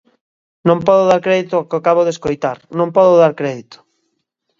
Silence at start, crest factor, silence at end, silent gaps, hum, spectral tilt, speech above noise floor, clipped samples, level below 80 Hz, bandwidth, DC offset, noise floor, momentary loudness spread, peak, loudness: 0.65 s; 16 dB; 0.85 s; none; none; -6.5 dB/octave; 57 dB; under 0.1%; -54 dBFS; 7.6 kHz; under 0.1%; -70 dBFS; 11 LU; 0 dBFS; -14 LUFS